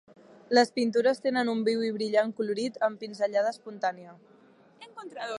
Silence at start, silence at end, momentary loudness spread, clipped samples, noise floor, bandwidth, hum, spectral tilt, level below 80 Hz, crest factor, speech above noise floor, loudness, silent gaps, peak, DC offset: 0.5 s; 0 s; 14 LU; under 0.1%; -58 dBFS; 11.5 kHz; none; -4.5 dB/octave; -84 dBFS; 20 dB; 30 dB; -28 LUFS; none; -8 dBFS; under 0.1%